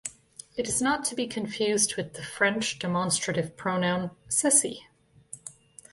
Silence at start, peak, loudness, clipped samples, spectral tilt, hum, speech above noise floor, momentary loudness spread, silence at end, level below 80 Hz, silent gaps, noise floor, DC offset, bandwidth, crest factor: 0.05 s; -6 dBFS; -26 LUFS; under 0.1%; -3 dB/octave; none; 22 dB; 20 LU; 0.4 s; -62 dBFS; none; -50 dBFS; under 0.1%; 12 kHz; 22 dB